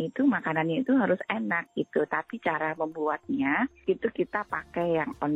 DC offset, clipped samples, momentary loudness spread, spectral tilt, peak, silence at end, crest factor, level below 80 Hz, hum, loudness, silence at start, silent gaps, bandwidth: under 0.1%; under 0.1%; 6 LU; -8 dB/octave; -12 dBFS; 0 s; 16 dB; -64 dBFS; none; -28 LUFS; 0 s; none; 4.2 kHz